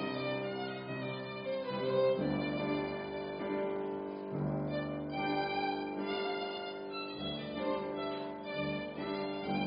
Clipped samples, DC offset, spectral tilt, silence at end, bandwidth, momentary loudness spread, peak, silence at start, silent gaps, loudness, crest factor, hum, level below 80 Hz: under 0.1%; under 0.1%; -4.5 dB/octave; 0 s; 5.2 kHz; 6 LU; -20 dBFS; 0 s; none; -37 LUFS; 16 dB; none; -64 dBFS